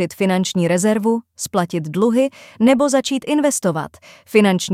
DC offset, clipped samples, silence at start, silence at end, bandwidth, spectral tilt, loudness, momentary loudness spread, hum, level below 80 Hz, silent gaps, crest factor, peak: under 0.1%; under 0.1%; 0 s; 0 s; 16 kHz; -5 dB/octave; -18 LUFS; 8 LU; none; -60 dBFS; none; 16 dB; -2 dBFS